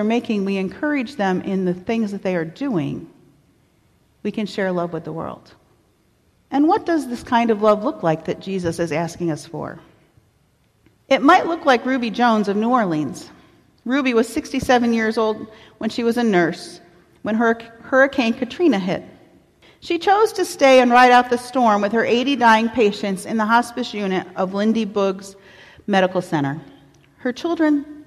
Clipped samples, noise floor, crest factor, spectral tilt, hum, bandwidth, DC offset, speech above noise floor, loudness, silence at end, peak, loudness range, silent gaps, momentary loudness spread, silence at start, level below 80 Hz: under 0.1%; -60 dBFS; 16 dB; -5.5 dB/octave; none; 14 kHz; under 0.1%; 42 dB; -19 LUFS; 0 s; -4 dBFS; 10 LU; none; 14 LU; 0 s; -56 dBFS